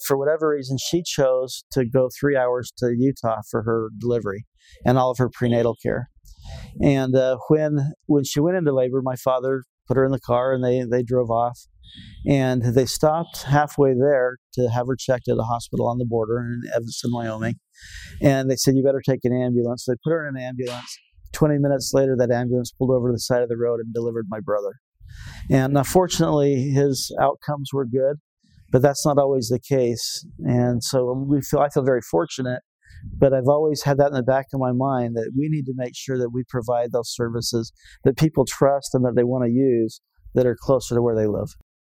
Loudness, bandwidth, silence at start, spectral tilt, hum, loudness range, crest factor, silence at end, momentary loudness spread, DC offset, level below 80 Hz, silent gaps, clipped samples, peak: -22 LUFS; 16.5 kHz; 0 s; -6 dB/octave; none; 3 LU; 20 dB; 0.35 s; 9 LU; under 0.1%; -48 dBFS; 1.63-1.70 s, 4.47-4.52 s, 9.69-9.78 s, 14.38-14.50 s, 24.80-24.92 s, 28.20-28.37 s, 32.65-32.79 s; under 0.1%; -2 dBFS